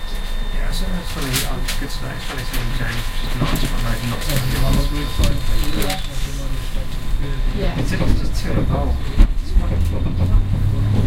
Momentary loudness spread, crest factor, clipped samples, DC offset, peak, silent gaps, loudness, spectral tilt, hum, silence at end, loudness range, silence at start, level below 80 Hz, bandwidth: 8 LU; 16 dB; under 0.1%; under 0.1%; 0 dBFS; none; -22 LUFS; -5 dB/octave; none; 0 s; 3 LU; 0 s; -20 dBFS; 17 kHz